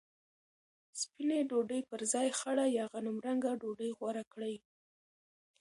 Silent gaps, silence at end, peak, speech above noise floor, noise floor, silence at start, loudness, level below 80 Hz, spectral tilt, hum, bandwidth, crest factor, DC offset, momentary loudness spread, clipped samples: 4.27-4.31 s; 1.05 s; -20 dBFS; over 54 dB; under -90 dBFS; 0.95 s; -36 LUFS; -86 dBFS; -3 dB/octave; none; 11.5 kHz; 18 dB; under 0.1%; 10 LU; under 0.1%